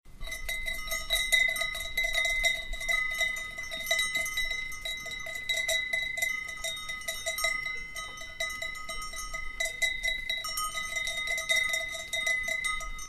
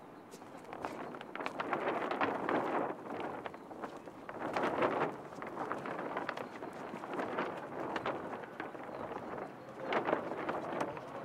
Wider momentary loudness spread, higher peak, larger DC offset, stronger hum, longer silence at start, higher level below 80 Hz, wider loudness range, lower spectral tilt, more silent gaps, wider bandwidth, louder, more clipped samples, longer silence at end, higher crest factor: about the same, 10 LU vs 12 LU; first, -10 dBFS vs -16 dBFS; neither; neither; about the same, 0.05 s vs 0 s; first, -46 dBFS vs -76 dBFS; about the same, 5 LU vs 3 LU; second, 0.5 dB/octave vs -5.5 dB/octave; neither; about the same, 15.5 kHz vs 16 kHz; first, -30 LUFS vs -39 LUFS; neither; about the same, 0 s vs 0 s; about the same, 22 dB vs 24 dB